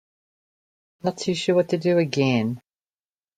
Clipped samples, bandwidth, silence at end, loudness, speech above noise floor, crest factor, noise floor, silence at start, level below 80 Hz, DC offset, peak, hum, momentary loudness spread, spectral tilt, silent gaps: under 0.1%; 9.6 kHz; 0.8 s; -23 LUFS; over 68 dB; 18 dB; under -90 dBFS; 1.05 s; -66 dBFS; under 0.1%; -6 dBFS; none; 9 LU; -6 dB/octave; none